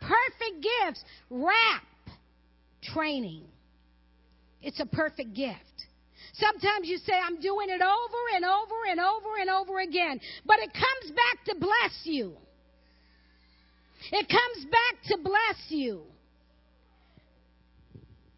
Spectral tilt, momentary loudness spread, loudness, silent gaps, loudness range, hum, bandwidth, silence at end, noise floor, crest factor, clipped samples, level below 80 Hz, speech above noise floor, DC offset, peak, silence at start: -7.5 dB/octave; 16 LU; -27 LUFS; none; 8 LU; none; 5.8 kHz; 0.4 s; -63 dBFS; 24 dB; under 0.1%; -60 dBFS; 35 dB; under 0.1%; -6 dBFS; 0 s